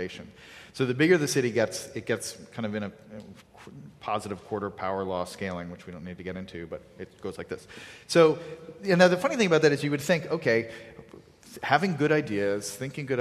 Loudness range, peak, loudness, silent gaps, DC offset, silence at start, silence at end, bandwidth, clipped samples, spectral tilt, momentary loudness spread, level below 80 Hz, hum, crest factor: 11 LU; -6 dBFS; -27 LUFS; none; under 0.1%; 0 s; 0 s; 14.5 kHz; under 0.1%; -5 dB/octave; 23 LU; -60 dBFS; none; 22 dB